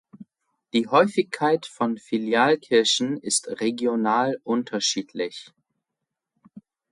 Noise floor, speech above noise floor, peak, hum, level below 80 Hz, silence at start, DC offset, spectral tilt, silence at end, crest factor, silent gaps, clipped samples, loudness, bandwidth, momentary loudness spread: -84 dBFS; 61 dB; -6 dBFS; none; -72 dBFS; 0.2 s; under 0.1%; -3 dB/octave; 0.3 s; 18 dB; none; under 0.1%; -23 LUFS; 11.5 kHz; 8 LU